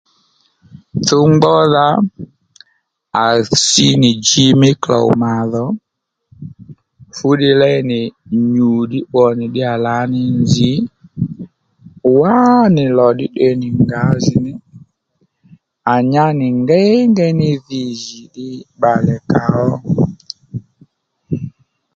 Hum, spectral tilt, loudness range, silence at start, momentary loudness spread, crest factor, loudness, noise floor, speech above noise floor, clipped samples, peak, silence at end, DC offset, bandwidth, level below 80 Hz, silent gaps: none; -5.5 dB/octave; 5 LU; 0.75 s; 18 LU; 14 dB; -13 LUFS; -63 dBFS; 51 dB; under 0.1%; 0 dBFS; 0.45 s; under 0.1%; 9.2 kHz; -46 dBFS; none